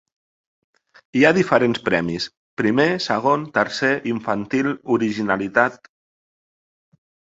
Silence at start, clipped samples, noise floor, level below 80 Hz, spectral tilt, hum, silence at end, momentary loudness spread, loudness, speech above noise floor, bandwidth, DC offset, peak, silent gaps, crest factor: 1.15 s; under 0.1%; under -90 dBFS; -58 dBFS; -5.5 dB/octave; none; 1.5 s; 7 LU; -20 LUFS; over 71 dB; 8 kHz; under 0.1%; 0 dBFS; 2.37-2.57 s; 22 dB